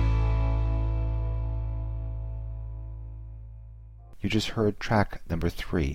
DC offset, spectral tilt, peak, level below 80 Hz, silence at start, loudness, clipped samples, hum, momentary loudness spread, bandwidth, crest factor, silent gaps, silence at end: under 0.1%; -7 dB/octave; -10 dBFS; -32 dBFS; 0 s; -30 LUFS; under 0.1%; none; 18 LU; 10.5 kHz; 18 dB; none; 0 s